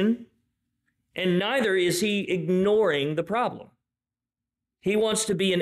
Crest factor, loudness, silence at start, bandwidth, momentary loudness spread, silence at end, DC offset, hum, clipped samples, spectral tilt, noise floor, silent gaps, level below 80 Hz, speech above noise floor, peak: 12 dB; -25 LUFS; 0 s; 15 kHz; 9 LU; 0 s; under 0.1%; none; under 0.1%; -4.5 dB/octave; under -90 dBFS; none; -64 dBFS; over 66 dB; -14 dBFS